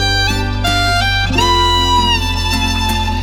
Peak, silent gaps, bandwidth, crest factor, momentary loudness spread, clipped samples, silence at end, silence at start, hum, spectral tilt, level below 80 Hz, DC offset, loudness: 0 dBFS; none; 17 kHz; 12 dB; 4 LU; under 0.1%; 0 s; 0 s; none; -3.5 dB/octave; -22 dBFS; under 0.1%; -13 LUFS